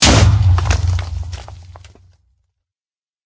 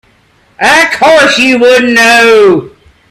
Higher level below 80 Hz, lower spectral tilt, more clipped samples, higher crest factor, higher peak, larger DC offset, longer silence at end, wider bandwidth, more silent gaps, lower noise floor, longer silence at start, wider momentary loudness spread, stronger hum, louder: first, -22 dBFS vs -44 dBFS; about the same, -4 dB/octave vs -3 dB/octave; second, under 0.1% vs 0.7%; first, 16 dB vs 6 dB; about the same, 0 dBFS vs 0 dBFS; neither; first, 1.5 s vs 0.4 s; second, 8 kHz vs 16 kHz; neither; first, under -90 dBFS vs -47 dBFS; second, 0 s vs 0.6 s; first, 20 LU vs 5 LU; neither; second, -15 LUFS vs -5 LUFS